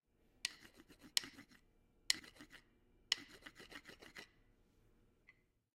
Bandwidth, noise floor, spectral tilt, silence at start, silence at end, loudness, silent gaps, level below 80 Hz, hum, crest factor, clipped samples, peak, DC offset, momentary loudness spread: 16 kHz; -73 dBFS; 0.5 dB/octave; 0.45 s; 0.45 s; -42 LUFS; none; -76 dBFS; none; 38 dB; under 0.1%; -12 dBFS; under 0.1%; 23 LU